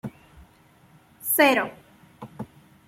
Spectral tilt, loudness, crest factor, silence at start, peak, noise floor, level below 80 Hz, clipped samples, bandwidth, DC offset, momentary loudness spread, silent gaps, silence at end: -3 dB/octave; -21 LUFS; 24 dB; 0.05 s; -4 dBFS; -56 dBFS; -62 dBFS; under 0.1%; 16.5 kHz; under 0.1%; 25 LU; none; 0.45 s